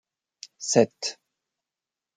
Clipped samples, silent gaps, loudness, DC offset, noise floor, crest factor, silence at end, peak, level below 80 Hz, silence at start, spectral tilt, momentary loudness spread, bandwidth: under 0.1%; none; -25 LUFS; under 0.1%; -89 dBFS; 24 dB; 1.05 s; -4 dBFS; -78 dBFS; 0.6 s; -3.5 dB/octave; 24 LU; 9.6 kHz